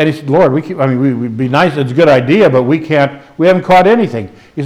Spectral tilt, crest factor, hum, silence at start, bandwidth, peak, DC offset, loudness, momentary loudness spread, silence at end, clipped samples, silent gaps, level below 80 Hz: -7.5 dB/octave; 10 dB; none; 0 s; 13 kHz; 0 dBFS; under 0.1%; -11 LUFS; 8 LU; 0 s; under 0.1%; none; -48 dBFS